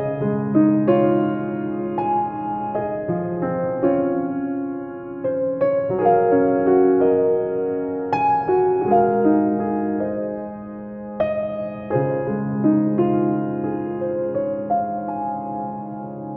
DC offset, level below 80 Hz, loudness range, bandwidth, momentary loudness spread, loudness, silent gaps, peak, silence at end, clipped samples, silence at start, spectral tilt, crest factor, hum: under 0.1%; -56 dBFS; 5 LU; 5.4 kHz; 11 LU; -21 LUFS; none; -6 dBFS; 0 s; under 0.1%; 0 s; -11.5 dB/octave; 16 dB; none